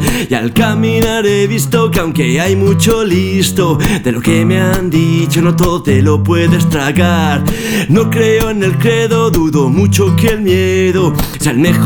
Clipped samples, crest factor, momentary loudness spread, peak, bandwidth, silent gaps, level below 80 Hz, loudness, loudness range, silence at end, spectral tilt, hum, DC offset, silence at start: under 0.1%; 10 dB; 3 LU; 0 dBFS; over 20 kHz; none; -28 dBFS; -11 LUFS; 1 LU; 0 s; -5.5 dB/octave; none; under 0.1%; 0 s